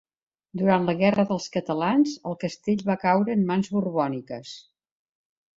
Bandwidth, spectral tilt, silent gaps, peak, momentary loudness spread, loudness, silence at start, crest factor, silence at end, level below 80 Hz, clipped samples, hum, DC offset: 7.8 kHz; -6.5 dB/octave; none; -6 dBFS; 14 LU; -24 LUFS; 0.55 s; 18 dB; 0.95 s; -64 dBFS; under 0.1%; none; under 0.1%